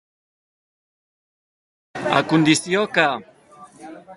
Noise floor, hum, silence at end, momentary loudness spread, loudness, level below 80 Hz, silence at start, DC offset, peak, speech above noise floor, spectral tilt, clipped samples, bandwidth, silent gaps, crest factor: -47 dBFS; none; 0 s; 17 LU; -19 LUFS; -64 dBFS; 1.95 s; under 0.1%; 0 dBFS; 29 dB; -4 dB/octave; under 0.1%; 11.5 kHz; none; 22 dB